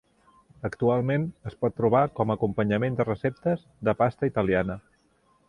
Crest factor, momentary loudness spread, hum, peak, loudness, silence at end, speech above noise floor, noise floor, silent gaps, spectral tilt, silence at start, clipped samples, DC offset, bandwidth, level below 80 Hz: 18 dB; 9 LU; none; -8 dBFS; -26 LUFS; 0.7 s; 40 dB; -65 dBFS; none; -9.5 dB/octave; 0.65 s; under 0.1%; under 0.1%; 10 kHz; -54 dBFS